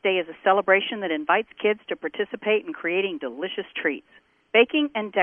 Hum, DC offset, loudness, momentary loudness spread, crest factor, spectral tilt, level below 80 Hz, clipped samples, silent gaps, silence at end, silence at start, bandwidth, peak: none; under 0.1%; -24 LUFS; 11 LU; 20 dB; -7 dB/octave; -72 dBFS; under 0.1%; none; 0 s; 0.05 s; 3.6 kHz; -4 dBFS